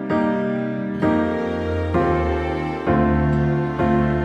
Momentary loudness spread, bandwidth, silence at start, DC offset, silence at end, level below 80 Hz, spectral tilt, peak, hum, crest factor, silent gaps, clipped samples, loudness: 5 LU; 8 kHz; 0 s; under 0.1%; 0 s; -32 dBFS; -9 dB/octave; -6 dBFS; none; 14 dB; none; under 0.1%; -21 LUFS